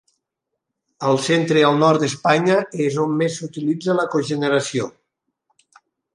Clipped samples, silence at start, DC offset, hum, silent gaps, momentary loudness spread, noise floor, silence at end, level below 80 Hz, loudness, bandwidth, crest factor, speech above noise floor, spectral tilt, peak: under 0.1%; 1 s; under 0.1%; none; none; 9 LU; -80 dBFS; 1.25 s; -68 dBFS; -19 LUFS; 11.5 kHz; 18 dB; 62 dB; -5.5 dB/octave; -2 dBFS